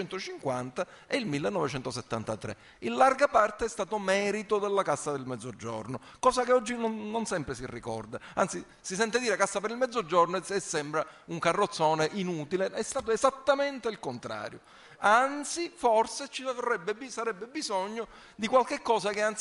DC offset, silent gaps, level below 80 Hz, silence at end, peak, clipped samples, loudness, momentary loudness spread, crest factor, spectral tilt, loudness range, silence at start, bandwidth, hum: under 0.1%; none; -62 dBFS; 0 s; -8 dBFS; under 0.1%; -30 LUFS; 13 LU; 22 dB; -4 dB/octave; 3 LU; 0 s; 11.5 kHz; none